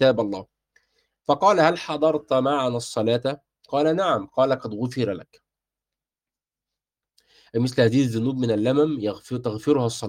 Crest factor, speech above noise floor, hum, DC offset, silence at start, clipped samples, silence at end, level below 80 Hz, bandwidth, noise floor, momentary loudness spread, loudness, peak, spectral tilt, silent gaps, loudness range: 20 dB; over 68 dB; none; under 0.1%; 0 s; under 0.1%; 0 s; -64 dBFS; 15.5 kHz; under -90 dBFS; 9 LU; -23 LUFS; -4 dBFS; -6 dB/octave; none; 6 LU